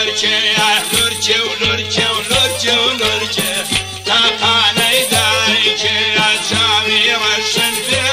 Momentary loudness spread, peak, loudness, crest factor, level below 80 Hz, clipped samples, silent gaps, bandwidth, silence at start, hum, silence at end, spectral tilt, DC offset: 4 LU; -2 dBFS; -12 LUFS; 12 dB; -44 dBFS; under 0.1%; none; 16 kHz; 0 s; none; 0 s; -1.5 dB/octave; under 0.1%